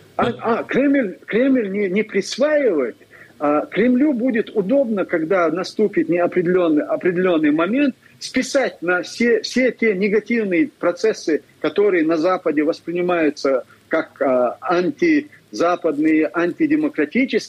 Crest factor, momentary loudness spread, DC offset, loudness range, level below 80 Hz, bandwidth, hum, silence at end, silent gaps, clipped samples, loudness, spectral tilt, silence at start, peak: 12 dB; 5 LU; under 0.1%; 1 LU; -62 dBFS; 12 kHz; none; 0 s; none; under 0.1%; -19 LUFS; -5.5 dB/octave; 0.2 s; -8 dBFS